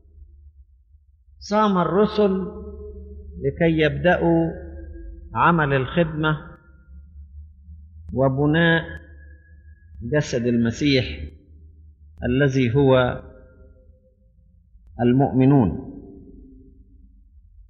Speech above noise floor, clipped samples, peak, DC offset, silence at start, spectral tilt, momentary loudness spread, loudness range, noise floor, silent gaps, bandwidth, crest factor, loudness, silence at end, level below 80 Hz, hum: 36 dB; under 0.1%; -4 dBFS; under 0.1%; 0.2 s; -5.5 dB/octave; 22 LU; 3 LU; -56 dBFS; none; 7.4 kHz; 18 dB; -20 LUFS; 0.1 s; -42 dBFS; none